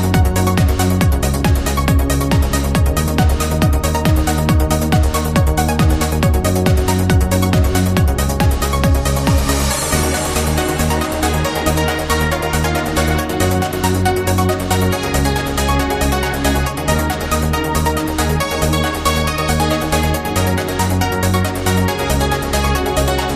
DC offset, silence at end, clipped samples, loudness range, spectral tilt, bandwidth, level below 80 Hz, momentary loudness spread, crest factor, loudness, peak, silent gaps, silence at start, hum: 0.1%; 0 s; under 0.1%; 2 LU; -5 dB/octave; 15.5 kHz; -20 dBFS; 2 LU; 14 dB; -16 LUFS; -2 dBFS; none; 0 s; none